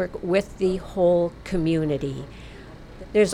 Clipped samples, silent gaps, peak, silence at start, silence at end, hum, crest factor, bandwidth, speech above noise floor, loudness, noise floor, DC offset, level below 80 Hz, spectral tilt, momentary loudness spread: under 0.1%; none; -8 dBFS; 0 s; 0 s; none; 16 dB; 12.5 kHz; 18 dB; -24 LUFS; -42 dBFS; under 0.1%; -42 dBFS; -6.5 dB/octave; 22 LU